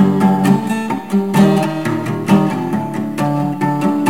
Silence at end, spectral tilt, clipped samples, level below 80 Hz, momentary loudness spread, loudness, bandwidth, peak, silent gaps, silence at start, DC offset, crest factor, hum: 0 s; -7 dB/octave; under 0.1%; -54 dBFS; 7 LU; -16 LUFS; 16 kHz; -2 dBFS; none; 0 s; 0.7%; 14 dB; none